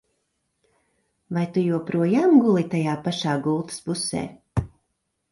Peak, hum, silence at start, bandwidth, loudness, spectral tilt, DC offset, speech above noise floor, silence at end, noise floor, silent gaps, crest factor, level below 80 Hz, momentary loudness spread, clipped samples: -6 dBFS; none; 1.3 s; 11.5 kHz; -23 LUFS; -6 dB/octave; under 0.1%; 54 dB; 0.65 s; -76 dBFS; none; 18 dB; -50 dBFS; 13 LU; under 0.1%